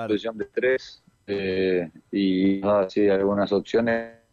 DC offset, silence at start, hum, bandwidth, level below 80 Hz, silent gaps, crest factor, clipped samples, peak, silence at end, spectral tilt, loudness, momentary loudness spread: under 0.1%; 0 s; none; 7.2 kHz; -60 dBFS; none; 12 dB; under 0.1%; -12 dBFS; 0.2 s; -7 dB/octave; -24 LUFS; 8 LU